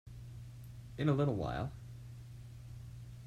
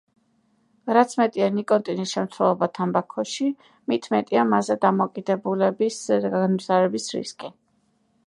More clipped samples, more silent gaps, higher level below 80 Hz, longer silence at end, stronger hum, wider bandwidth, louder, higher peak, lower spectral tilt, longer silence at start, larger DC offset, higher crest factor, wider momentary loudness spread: neither; neither; first, -56 dBFS vs -74 dBFS; second, 0 s vs 0.8 s; first, 60 Hz at -50 dBFS vs none; first, 14 kHz vs 11.5 kHz; second, -36 LUFS vs -23 LUFS; second, -18 dBFS vs -2 dBFS; first, -8 dB/octave vs -5.5 dB/octave; second, 0.05 s vs 0.85 s; neither; about the same, 20 dB vs 20 dB; first, 18 LU vs 9 LU